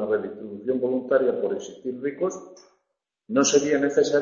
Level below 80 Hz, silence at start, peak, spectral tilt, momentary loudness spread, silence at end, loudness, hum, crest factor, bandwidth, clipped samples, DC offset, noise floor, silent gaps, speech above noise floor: -66 dBFS; 0 s; -6 dBFS; -3.5 dB/octave; 13 LU; 0 s; -24 LUFS; none; 18 dB; 7.6 kHz; under 0.1%; under 0.1%; -80 dBFS; none; 56 dB